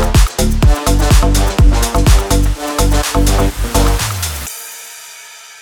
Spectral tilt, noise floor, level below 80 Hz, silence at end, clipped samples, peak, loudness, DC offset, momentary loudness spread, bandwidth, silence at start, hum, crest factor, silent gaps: -4.5 dB/octave; -35 dBFS; -14 dBFS; 0.1 s; under 0.1%; 0 dBFS; -14 LUFS; under 0.1%; 16 LU; 19 kHz; 0 s; none; 12 dB; none